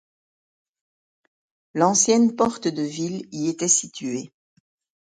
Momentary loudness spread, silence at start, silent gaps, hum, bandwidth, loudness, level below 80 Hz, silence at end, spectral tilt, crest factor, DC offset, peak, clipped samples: 13 LU; 1.75 s; none; none; 9.6 kHz; -21 LUFS; -66 dBFS; 0.75 s; -3.5 dB/octave; 20 dB; under 0.1%; -4 dBFS; under 0.1%